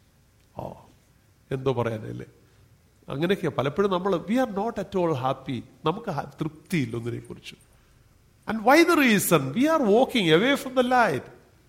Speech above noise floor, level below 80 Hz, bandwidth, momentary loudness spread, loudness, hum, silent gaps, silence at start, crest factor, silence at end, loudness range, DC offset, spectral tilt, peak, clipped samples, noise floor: 36 dB; -58 dBFS; 16.5 kHz; 20 LU; -24 LUFS; none; none; 0.55 s; 20 dB; 0.35 s; 11 LU; under 0.1%; -5 dB/octave; -6 dBFS; under 0.1%; -60 dBFS